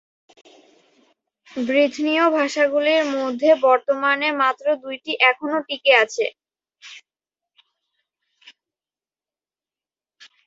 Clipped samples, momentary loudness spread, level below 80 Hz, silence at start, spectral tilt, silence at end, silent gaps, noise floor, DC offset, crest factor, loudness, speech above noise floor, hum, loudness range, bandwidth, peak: under 0.1%; 12 LU; -74 dBFS; 1.55 s; -2 dB/octave; 3.5 s; none; under -90 dBFS; under 0.1%; 20 dB; -19 LUFS; over 71 dB; none; 5 LU; 7.8 kHz; -2 dBFS